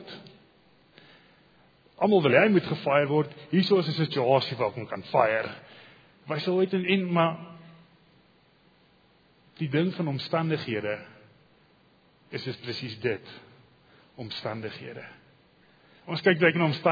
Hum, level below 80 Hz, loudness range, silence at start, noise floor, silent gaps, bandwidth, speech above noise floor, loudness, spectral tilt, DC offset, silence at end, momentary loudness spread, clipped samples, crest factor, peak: none; -72 dBFS; 12 LU; 0 s; -62 dBFS; none; 5 kHz; 36 dB; -26 LUFS; -8 dB/octave; under 0.1%; 0 s; 18 LU; under 0.1%; 22 dB; -6 dBFS